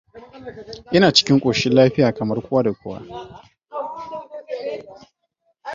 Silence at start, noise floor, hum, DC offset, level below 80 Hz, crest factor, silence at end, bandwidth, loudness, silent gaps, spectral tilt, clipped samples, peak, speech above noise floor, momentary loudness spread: 0.15 s; -69 dBFS; none; under 0.1%; -54 dBFS; 20 dB; 0 s; 7.8 kHz; -18 LUFS; none; -5 dB/octave; under 0.1%; 0 dBFS; 51 dB; 23 LU